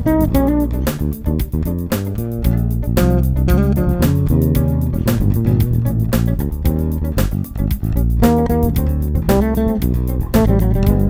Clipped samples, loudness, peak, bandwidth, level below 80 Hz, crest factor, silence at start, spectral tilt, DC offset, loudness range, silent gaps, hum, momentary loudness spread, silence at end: under 0.1%; -17 LUFS; -2 dBFS; 16.5 kHz; -20 dBFS; 14 dB; 0 s; -8 dB/octave; under 0.1%; 2 LU; none; none; 6 LU; 0 s